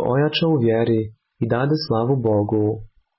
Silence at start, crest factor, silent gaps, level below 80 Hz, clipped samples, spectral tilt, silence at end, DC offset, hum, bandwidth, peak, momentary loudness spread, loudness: 0 s; 12 dB; none; -50 dBFS; under 0.1%; -11 dB/octave; 0.35 s; under 0.1%; none; 5.8 kHz; -8 dBFS; 7 LU; -20 LUFS